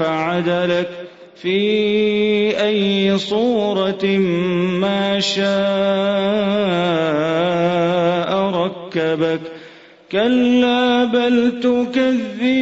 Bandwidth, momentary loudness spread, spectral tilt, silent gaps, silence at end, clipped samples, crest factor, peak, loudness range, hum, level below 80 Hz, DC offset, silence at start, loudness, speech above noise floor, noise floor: 8 kHz; 6 LU; -6 dB/octave; none; 0 s; under 0.1%; 12 dB; -6 dBFS; 1 LU; none; -56 dBFS; under 0.1%; 0 s; -17 LUFS; 25 dB; -42 dBFS